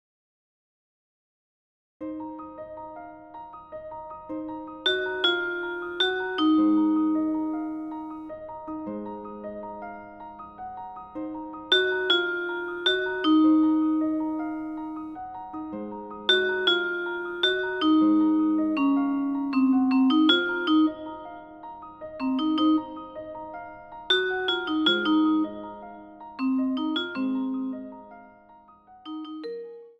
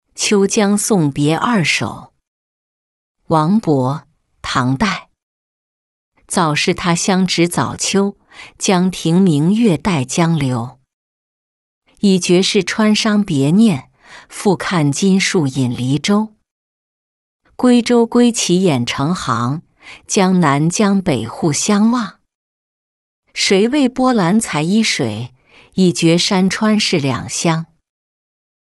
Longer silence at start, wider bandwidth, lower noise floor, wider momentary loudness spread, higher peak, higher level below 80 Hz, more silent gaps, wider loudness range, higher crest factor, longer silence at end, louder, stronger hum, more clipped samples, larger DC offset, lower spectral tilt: first, 2 s vs 0.15 s; second, 7.8 kHz vs 12 kHz; second, -53 dBFS vs under -90 dBFS; first, 19 LU vs 8 LU; second, -6 dBFS vs -2 dBFS; second, -64 dBFS vs -50 dBFS; second, none vs 2.27-3.15 s, 5.23-6.12 s, 10.93-11.82 s, 16.51-17.40 s, 22.35-23.23 s; first, 14 LU vs 4 LU; first, 20 dB vs 14 dB; second, 0.1 s vs 1.15 s; second, -25 LUFS vs -15 LUFS; neither; neither; neither; about the same, -4.5 dB/octave vs -5 dB/octave